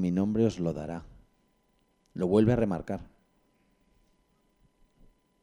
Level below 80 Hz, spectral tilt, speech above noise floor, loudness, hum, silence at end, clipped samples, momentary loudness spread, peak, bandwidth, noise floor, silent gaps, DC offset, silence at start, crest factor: -54 dBFS; -8.5 dB/octave; 43 dB; -29 LUFS; none; 2.4 s; under 0.1%; 16 LU; -10 dBFS; 10.5 kHz; -70 dBFS; none; under 0.1%; 0 s; 22 dB